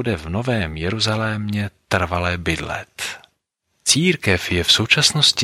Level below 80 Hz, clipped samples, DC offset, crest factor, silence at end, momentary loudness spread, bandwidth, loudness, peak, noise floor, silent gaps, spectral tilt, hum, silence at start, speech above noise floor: -40 dBFS; under 0.1%; under 0.1%; 20 dB; 0 s; 13 LU; 16.5 kHz; -19 LUFS; 0 dBFS; -71 dBFS; none; -3 dB/octave; none; 0 s; 51 dB